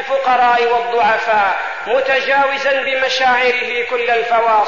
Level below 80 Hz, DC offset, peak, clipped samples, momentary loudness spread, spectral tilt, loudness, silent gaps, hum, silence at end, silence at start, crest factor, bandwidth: -58 dBFS; 0.8%; -4 dBFS; under 0.1%; 5 LU; -2 dB/octave; -14 LUFS; none; none; 0 s; 0 s; 10 dB; 7.4 kHz